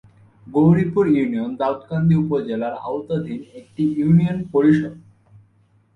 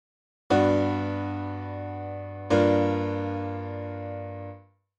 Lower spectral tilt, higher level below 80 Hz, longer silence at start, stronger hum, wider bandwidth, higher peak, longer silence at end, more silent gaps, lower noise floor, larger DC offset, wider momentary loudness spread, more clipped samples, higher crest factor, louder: first, -10 dB/octave vs -7.5 dB/octave; first, -52 dBFS vs -60 dBFS; about the same, 0.45 s vs 0.5 s; neither; second, 4.3 kHz vs 8.8 kHz; first, -4 dBFS vs -8 dBFS; first, 0.95 s vs 0.4 s; neither; first, -58 dBFS vs -47 dBFS; neither; second, 10 LU vs 15 LU; neither; about the same, 16 dB vs 18 dB; first, -19 LUFS vs -27 LUFS